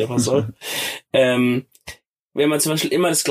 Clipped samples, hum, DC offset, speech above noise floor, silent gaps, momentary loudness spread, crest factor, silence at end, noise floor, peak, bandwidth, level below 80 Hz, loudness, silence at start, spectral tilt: under 0.1%; none; under 0.1%; 24 dB; 2.08-2.30 s; 15 LU; 16 dB; 0 s; -42 dBFS; -4 dBFS; 15.5 kHz; -58 dBFS; -19 LUFS; 0 s; -4 dB/octave